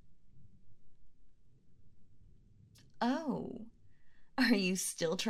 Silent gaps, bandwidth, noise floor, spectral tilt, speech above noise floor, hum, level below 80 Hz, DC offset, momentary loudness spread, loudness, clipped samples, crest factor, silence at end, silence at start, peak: none; 15.5 kHz; -62 dBFS; -3.5 dB/octave; 28 dB; none; -68 dBFS; under 0.1%; 17 LU; -34 LUFS; under 0.1%; 22 dB; 0 s; 0.05 s; -16 dBFS